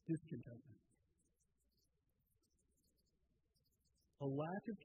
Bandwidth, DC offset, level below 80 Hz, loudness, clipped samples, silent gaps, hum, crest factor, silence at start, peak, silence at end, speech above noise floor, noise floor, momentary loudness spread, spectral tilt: 12 kHz; under 0.1%; -84 dBFS; -47 LUFS; under 0.1%; none; none; 20 dB; 0.05 s; -32 dBFS; 0 s; 38 dB; -84 dBFS; 15 LU; -9 dB/octave